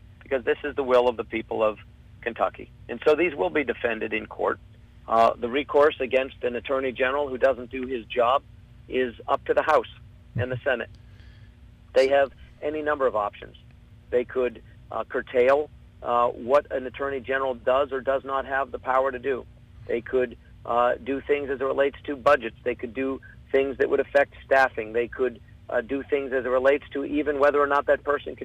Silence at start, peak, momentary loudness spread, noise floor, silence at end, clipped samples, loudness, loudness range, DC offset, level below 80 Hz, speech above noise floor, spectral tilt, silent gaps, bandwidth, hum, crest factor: 0.3 s; -8 dBFS; 10 LU; -49 dBFS; 0 s; under 0.1%; -25 LUFS; 3 LU; under 0.1%; -52 dBFS; 25 dB; -6 dB/octave; none; 9.8 kHz; none; 16 dB